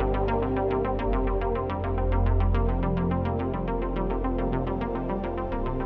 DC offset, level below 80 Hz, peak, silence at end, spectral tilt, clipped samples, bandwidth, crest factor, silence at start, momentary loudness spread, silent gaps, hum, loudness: under 0.1%; -30 dBFS; -12 dBFS; 0 s; -10.5 dB/octave; under 0.1%; 4.4 kHz; 14 dB; 0 s; 5 LU; none; none; -28 LUFS